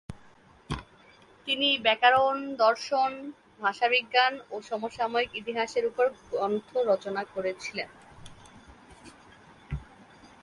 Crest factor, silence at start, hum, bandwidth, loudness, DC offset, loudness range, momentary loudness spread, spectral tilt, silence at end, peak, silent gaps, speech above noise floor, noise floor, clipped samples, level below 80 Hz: 20 dB; 0.1 s; none; 11.5 kHz; -27 LUFS; under 0.1%; 9 LU; 18 LU; -4 dB/octave; 0.15 s; -8 dBFS; none; 29 dB; -56 dBFS; under 0.1%; -54 dBFS